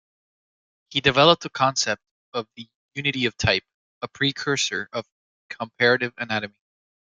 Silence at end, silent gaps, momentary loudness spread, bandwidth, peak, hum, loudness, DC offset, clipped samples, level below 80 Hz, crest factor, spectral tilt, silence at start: 0.7 s; 2.11-2.32 s, 2.75-2.89 s, 3.74-4.01 s, 5.12-5.49 s; 18 LU; 9.4 kHz; -2 dBFS; none; -22 LUFS; under 0.1%; under 0.1%; -56 dBFS; 24 dB; -3.5 dB/octave; 0.9 s